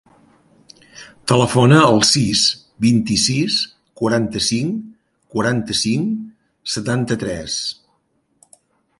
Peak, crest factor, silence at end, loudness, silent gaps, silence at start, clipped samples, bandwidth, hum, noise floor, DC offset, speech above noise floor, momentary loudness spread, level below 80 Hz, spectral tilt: 0 dBFS; 18 dB; 1.25 s; -17 LUFS; none; 0.95 s; under 0.1%; 11.5 kHz; none; -65 dBFS; under 0.1%; 48 dB; 15 LU; -48 dBFS; -4.5 dB/octave